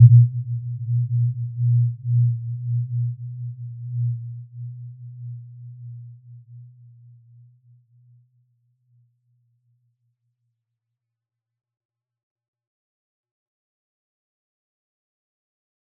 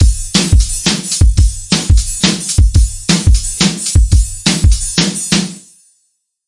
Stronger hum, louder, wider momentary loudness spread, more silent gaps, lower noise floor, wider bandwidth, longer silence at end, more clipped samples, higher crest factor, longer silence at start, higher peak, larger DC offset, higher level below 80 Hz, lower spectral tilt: neither; second, -23 LUFS vs -12 LUFS; first, 21 LU vs 3 LU; neither; first, -86 dBFS vs -63 dBFS; second, 0.3 kHz vs 11.5 kHz; first, 9.3 s vs 0.9 s; neither; first, 24 dB vs 12 dB; about the same, 0 s vs 0 s; about the same, -2 dBFS vs 0 dBFS; neither; second, -66 dBFS vs -14 dBFS; first, -19 dB/octave vs -3.5 dB/octave